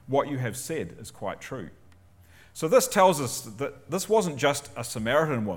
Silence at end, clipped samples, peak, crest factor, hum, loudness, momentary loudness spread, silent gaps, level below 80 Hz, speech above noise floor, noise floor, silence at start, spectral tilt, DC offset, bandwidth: 0 s; under 0.1%; -6 dBFS; 20 dB; none; -26 LUFS; 16 LU; none; -60 dBFS; 28 dB; -54 dBFS; 0.05 s; -4.5 dB/octave; under 0.1%; 18.5 kHz